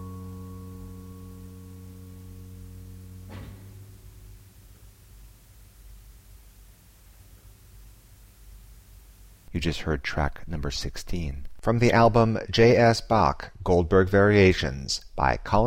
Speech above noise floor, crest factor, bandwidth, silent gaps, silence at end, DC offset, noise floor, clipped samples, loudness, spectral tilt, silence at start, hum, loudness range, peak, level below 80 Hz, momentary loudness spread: 30 dB; 18 dB; 16.5 kHz; none; 0 s; under 0.1%; -52 dBFS; under 0.1%; -23 LUFS; -6 dB/octave; 0 s; none; 25 LU; -8 dBFS; -40 dBFS; 26 LU